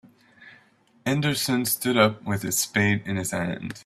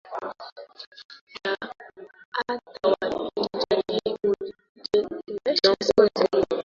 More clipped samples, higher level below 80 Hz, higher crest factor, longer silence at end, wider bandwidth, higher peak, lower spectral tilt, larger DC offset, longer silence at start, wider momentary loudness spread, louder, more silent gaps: neither; about the same, -60 dBFS vs -60 dBFS; about the same, 22 dB vs 22 dB; about the same, 0.05 s vs 0.05 s; first, 16 kHz vs 7.4 kHz; about the same, -4 dBFS vs -4 dBFS; about the same, -4 dB/octave vs -4.5 dB/octave; neither; first, 0.4 s vs 0.05 s; second, 8 LU vs 22 LU; about the same, -24 LUFS vs -25 LUFS; second, none vs 0.52-0.56 s, 0.87-0.92 s, 1.05-1.09 s, 1.21-1.27 s, 2.25-2.32 s, 4.69-4.75 s